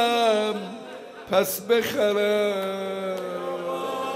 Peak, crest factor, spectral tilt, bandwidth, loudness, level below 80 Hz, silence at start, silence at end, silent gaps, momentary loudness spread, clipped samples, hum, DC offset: -8 dBFS; 16 dB; -3.5 dB/octave; 15.5 kHz; -25 LUFS; -68 dBFS; 0 s; 0 s; none; 12 LU; under 0.1%; none; under 0.1%